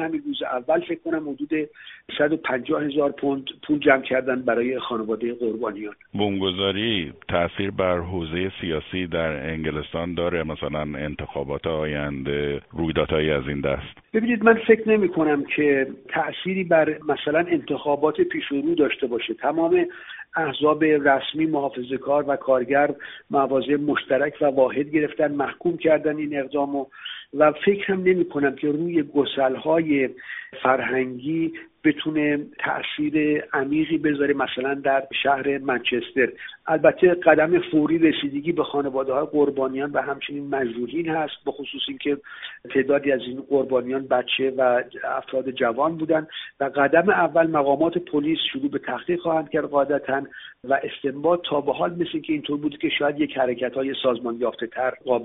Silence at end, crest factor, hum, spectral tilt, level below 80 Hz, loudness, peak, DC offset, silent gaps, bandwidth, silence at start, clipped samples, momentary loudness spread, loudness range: 0 s; 20 dB; none; -3.5 dB/octave; -52 dBFS; -23 LUFS; -2 dBFS; under 0.1%; none; 4 kHz; 0 s; under 0.1%; 9 LU; 5 LU